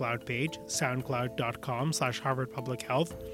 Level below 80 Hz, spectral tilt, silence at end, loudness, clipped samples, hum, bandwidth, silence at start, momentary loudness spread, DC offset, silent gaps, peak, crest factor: -60 dBFS; -4.5 dB/octave; 0 s; -32 LUFS; under 0.1%; none; 16.5 kHz; 0 s; 4 LU; under 0.1%; none; -14 dBFS; 20 dB